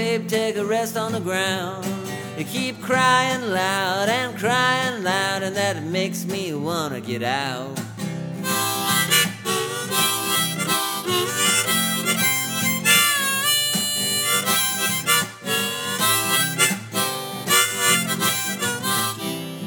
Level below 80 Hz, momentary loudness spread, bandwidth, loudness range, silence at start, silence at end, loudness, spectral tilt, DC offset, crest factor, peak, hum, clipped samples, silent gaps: -64 dBFS; 9 LU; over 20 kHz; 5 LU; 0 s; 0 s; -20 LUFS; -2 dB/octave; under 0.1%; 22 dB; 0 dBFS; none; under 0.1%; none